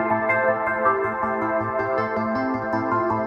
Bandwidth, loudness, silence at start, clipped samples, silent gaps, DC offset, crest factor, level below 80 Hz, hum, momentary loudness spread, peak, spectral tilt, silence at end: 7 kHz; -22 LUFS; 0 s; under 0.1%; none; under 0.1%; 14 dB; -56 dBFS; none; 4 LU; -8 dBFS; -8.5 dB/octave; 0 s